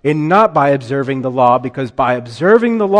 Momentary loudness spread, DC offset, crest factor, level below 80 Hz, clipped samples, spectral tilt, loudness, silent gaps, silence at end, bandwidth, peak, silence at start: 7 LU; under 0.1%; 12 dB; -50 dBFS; under 0.1%; -7.5 dB/octave; -14 LUFS; none; 0 s; 10 kHz; 0 dBFS; 0.05 s